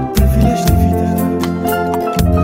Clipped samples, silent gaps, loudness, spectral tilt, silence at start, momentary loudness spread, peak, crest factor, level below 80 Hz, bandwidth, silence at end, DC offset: under 0.1%; none; -14 LUFS; -7 dB/octave; 0 s; 4 LU; 0 dBFS; 12 dB; -20 dBFS; 16.5 kHz; 0 s; under 0.1%